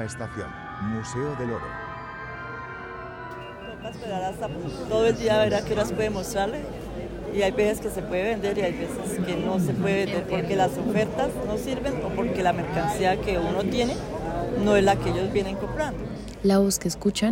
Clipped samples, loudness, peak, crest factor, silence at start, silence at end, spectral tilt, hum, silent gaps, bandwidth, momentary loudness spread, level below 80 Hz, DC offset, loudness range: under 0.1%; -26 LUFS; -8 dBFS; 18 dB; 0 s; 0 s; -5.5 dB/octave; none; none; 16.5 kHz; 14 LU; -42 dBFS; under 0.1%; 9 LU